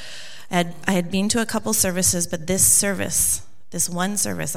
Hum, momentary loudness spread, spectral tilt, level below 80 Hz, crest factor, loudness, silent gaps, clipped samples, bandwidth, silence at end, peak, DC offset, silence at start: none; 11 LU; -3 dB/octave; -48 dBFS; 20 dB; -20 LUFS; none; under 0.1%; 17 kHz; 0 s; -2 dBFS; 2%; 0 s